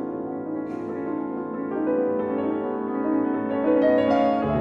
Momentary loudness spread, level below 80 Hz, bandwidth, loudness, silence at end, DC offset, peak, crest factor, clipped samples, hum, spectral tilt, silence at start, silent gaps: 11 LU; -54 dBFS; 6.2 kHz; -24 LUFS; 0 s; under 0.1%; -10 dBFS; 14 dB; under 0.1%; none; -9 dB/octave; 0 s; none